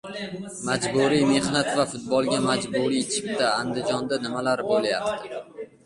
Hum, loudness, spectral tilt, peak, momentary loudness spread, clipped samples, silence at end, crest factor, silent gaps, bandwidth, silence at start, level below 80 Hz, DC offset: none; -24 LUFS; -4 dB/octave; -8 dBFS; 12 LU; under 0.1%; 0.2 s; 16 dB; none; 11.5 kHz; 0.05 s; -60 dBFS; under 0.1%